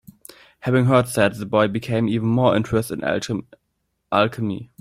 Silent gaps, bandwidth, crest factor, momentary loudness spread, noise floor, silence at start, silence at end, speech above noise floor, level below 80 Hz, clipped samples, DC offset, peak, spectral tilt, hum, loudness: none; 16 kHz; 18 dB; 10 LU; -72 dBFS; 0.65 s; 0.15 s; 52 dB; -52 dBFS; under 0.1%; under 0.1%; -2 dBFS; -6.5 dB/octave; none; -21 LUFS